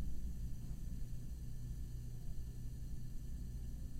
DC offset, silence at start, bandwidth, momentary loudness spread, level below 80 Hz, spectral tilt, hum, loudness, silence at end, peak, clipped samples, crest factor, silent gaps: under 0.1%; 0 s; 15.5 kHz; 2 LU; -46 dBFS; -7 dB/octave; none; -49 LUFS; 0 s; -32 dBFS; under 0.1%; 12 dB; none